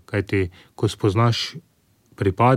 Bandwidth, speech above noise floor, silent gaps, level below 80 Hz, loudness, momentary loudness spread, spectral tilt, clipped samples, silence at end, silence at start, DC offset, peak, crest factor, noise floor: 13 kHz; 38 dB; none; -50 dBFS; -23 LUFS; 11 LU; -6.5 dB/octave; under 0.1%; 0 s; 0.1 s; under 0.1%; -4 dBFS; 18 dB; -59 dBFS